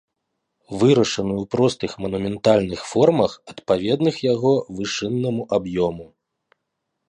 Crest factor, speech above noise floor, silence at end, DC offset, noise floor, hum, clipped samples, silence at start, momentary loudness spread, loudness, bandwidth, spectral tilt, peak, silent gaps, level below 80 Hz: 18 dB; 58 dB; 1.05 s; under 0.1%; -78 dBFS; none; under 0.1%; 0.7 s; 9 LU; -21 LUFS; 11 kHz; -6 dB/octave; -2 dBFS; none; -52 dBFS